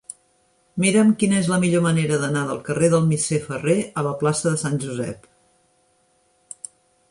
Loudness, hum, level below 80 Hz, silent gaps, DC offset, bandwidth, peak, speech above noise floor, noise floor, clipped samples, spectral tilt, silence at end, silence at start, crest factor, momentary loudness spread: -20 LUFS; none; -58 dBFS; none; under 0.1%; 11.5 kHz; -6 dBFS; 43 dB; -63 dBFS; under 0.1%; -5.5 dB/octave; 1.95 s; 0.75 s; 16 dB; 20 LU